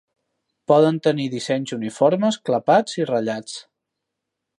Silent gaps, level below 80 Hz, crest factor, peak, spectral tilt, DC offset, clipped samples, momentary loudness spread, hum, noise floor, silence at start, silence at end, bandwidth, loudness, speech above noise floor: none; -72 dBFS; 18 dB; -2 dBFS; -5.5 dB/octave; under 0.1%; under 0.1%; 13 LU; none; -81 dBFS; 0.7 s; 0.95 s; 11.5 kHz; -20 LUFS; 62 dB